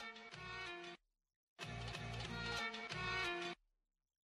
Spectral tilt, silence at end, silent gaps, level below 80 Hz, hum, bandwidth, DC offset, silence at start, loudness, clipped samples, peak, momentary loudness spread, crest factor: -4 dB/octave; 0.75 s; 1.36-1.56 s; -62 dBFS; none; 13.5 kHz; under 0.1%; 0 s; -45 LUFS; under 0.1%; -28 dBFS; 12 LU; 20 dB